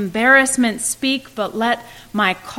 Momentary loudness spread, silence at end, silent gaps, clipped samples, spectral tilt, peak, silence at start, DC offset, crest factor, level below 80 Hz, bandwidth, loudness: 12 LU; 0 s; none; under 0.1%; -2.5 dB/octave; -2 dBFS; 0 s; under 0.1%; 18 dB; -52 dBFS; 16.5 kHz; -17 LUFS